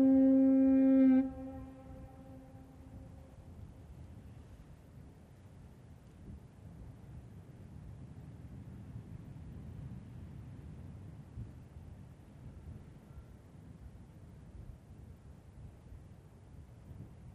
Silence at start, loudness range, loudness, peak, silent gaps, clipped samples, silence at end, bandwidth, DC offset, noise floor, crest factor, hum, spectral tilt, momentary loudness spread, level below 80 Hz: 0 s; 21 LU; -28 LUFS; -20 dBFS; none; under 0.1%; 0.3 s; 3.1 kHz; under 0.1%; -56 dBFS; 18 dB; none; -10 dB/octave; 29 LU; -58 dBFS